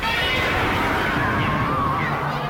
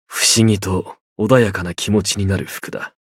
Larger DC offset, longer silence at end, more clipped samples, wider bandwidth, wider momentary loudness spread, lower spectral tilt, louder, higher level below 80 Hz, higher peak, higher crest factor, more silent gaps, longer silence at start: neither; second, 0 s vs 0.2 s; neither; about the same, 17 kHz vs 16.5 kHz; second, 2 LU vs 14 LU; about the same, -5 dB/octave vs -4 dB/octave; second, -21 LUFS vs -17 LUFS; first, -36 dBFS vs -48 dBFS; second, -10 dBFS vs 0 dBFS; second, 12 dB vs 18 dB; second, none vs 1.01-1.16 s; about the same, 0 s vs 0.1 s